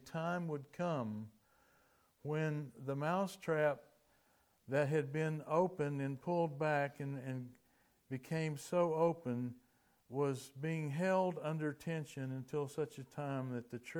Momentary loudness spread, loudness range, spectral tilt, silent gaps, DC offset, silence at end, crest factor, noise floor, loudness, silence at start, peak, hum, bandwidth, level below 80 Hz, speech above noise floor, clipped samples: 10 LU; 3 LU; -7 dB/octave; none; under 0.1%; 0 s; 18 dB; -74 dBFS; -39 LUFS; 0.05 s; -22 dBFS; none; 18 kHz; -80 dBFS; 36 dB; under 0.1%